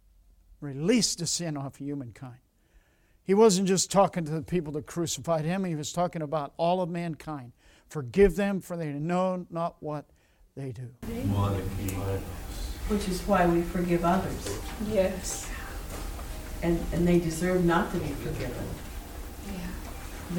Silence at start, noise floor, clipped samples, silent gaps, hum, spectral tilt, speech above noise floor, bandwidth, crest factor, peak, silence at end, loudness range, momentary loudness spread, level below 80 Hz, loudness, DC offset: 0.5 s; -62 dBFS; under 0.1%; none; none; -5 dB/octave; 34 dB; 19 kHz; 20 dB; -10 dBFS; 0 s; 6 LU; 16 LU; -42 dBFS; -29 LUFS; under 0.1%